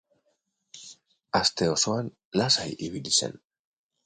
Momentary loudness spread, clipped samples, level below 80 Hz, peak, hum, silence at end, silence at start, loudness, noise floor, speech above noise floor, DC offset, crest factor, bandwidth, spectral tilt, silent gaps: 17 LU; under 0.1%; -60 dBFS; -8 dBFS; none; 0.7 s; 0.75 s; -25 LUFS; -75 dBFS; 48 dB; under 0.1%; 22 dB; 10 kHz; -3 dB/octave; 2.25-2.31 s